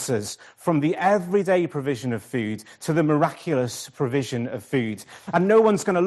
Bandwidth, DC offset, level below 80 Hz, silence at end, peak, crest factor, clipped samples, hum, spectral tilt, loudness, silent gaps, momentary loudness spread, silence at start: 12.5 kHz; under 0.1%; -66 dBFS; 0 s; -6 dBFS; 18 dB; under 0.1%; none; -6 dB/octave; -23 LUFS; none; 11 LU; 0 s